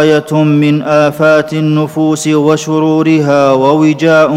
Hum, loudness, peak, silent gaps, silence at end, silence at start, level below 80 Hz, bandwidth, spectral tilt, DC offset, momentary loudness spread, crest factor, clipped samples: none; -10 LUFS; 0 dBFS; none; 0 s; 0 s; -56 dBFS; 14 kHz; -6.5 dB/octave; under 0.1%; 4 LU; 8 dB; 0.7%